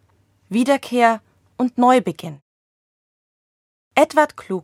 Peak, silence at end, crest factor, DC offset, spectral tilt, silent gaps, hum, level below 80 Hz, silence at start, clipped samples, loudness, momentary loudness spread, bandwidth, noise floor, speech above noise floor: 0 dBFS; 0.05 s; 20 dB; under 0.1%; -5 dB/octave; 2.42-3.91 s; none; -68 dBFS; 0.5 s; under 0.1%; -18 LUFS; 13 LU; 15.5 kHz; -60 dBFS; 42 dB